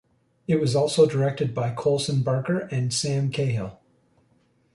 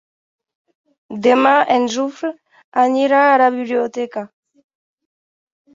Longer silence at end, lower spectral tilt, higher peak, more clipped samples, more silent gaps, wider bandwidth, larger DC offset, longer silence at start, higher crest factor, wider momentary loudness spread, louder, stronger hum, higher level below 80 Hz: second, 1 s vs 1.5 s; first, -5.5 dB/octave vs -4 dB/octave; second, -6 dBFS vs -2 dBFS; neither; second, none vs 2.64-2.72 s; first, 11.5 kHz vs 7.6 kHz; neither; second, 0.5 s vs 1.1 s; about the same, 18 dB vs 16 dB; second, 7 LU vs 15 LU; second, -24 LUFS vs -16 LUFS; neither; first, -58 dBFS vs -68 dBFS